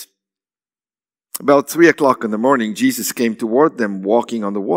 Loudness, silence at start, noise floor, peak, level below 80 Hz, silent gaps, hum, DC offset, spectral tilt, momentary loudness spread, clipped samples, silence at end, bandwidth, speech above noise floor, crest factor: -16 LUFS; 0 s; under -90 dBFS; 0 dBFS; -68 dBFS; none; none; under 0.1%; -4.5 dB/octave; 10 LU; under 0.1%; 0 s; 16.5 kHz; over 75 dB; 16 dB